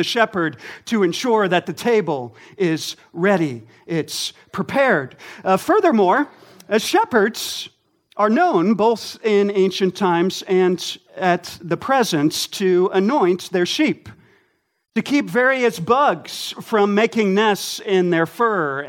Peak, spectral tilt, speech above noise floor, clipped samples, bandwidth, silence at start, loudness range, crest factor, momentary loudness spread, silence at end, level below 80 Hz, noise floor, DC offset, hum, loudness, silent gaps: -2 dBFS; -4.5 dB/octave; 49 dB; under 0.1%; 17 kHz; 0 s; 3 LU; 18 dB; 10 LU; 0 s; -66 dBFS; -68 dBFS; under 0.1%; none; -19 LUFS; none